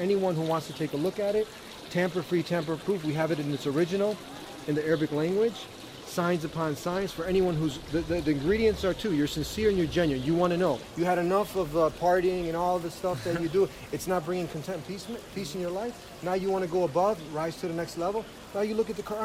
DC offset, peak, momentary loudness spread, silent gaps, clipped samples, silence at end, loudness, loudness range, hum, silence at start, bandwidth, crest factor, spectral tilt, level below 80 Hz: under 0.1%; -12 dBFS; 10 LU; none; under 0.1%; 0 s; -29 LUFS; 4 LU; none; 0 s; 16 kHz; 16 dB; -6 dB/octave; -50 dBFS